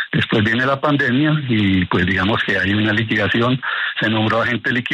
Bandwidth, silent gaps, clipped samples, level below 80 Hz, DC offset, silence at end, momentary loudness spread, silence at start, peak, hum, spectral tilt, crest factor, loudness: 9.4 kHz; none; under 0.1%; -48 dBFS; under 0.1%; 0 s; 2 LU; 0 s; -4 dBFS; none; -7 dB/octave; 14 dB; -17 LUFS